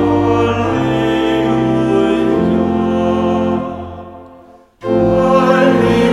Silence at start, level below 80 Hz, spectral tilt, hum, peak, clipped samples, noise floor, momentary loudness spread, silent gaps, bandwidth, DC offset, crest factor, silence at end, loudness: 0 s; -38 dBFS; -7.5 dB/octave; none; 0 dBFS; under 0.1%; -42 dBFS; 12 LU; none; 11.5 kHz; under 0.1%; 14 dB; 0 s; -13 LUFS